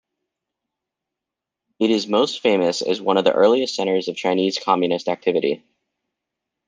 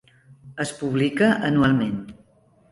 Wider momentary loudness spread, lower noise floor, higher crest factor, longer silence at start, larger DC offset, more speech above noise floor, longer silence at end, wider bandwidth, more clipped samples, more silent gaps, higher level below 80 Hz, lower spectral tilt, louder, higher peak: second, 6 LU vs 16 LU; first, -85 dBFS vs -58 dBFS; about the same, 20 dB vs 16 dB; first, 1.8 s vs 0.45 s; neither; first, 66 dB vs 37 dB; first, 1.1 s vs 0.6 s; second, 9.6 kHz vs 11.5 kHz; neither; neither; second, -68 dBFS vs -52 dBFS; second, -4.5 dB/octave vs -6 dB/octave; about the same, -20 LUFS vs -22 LUFS; first, -2 dBFS vs -6 dBFS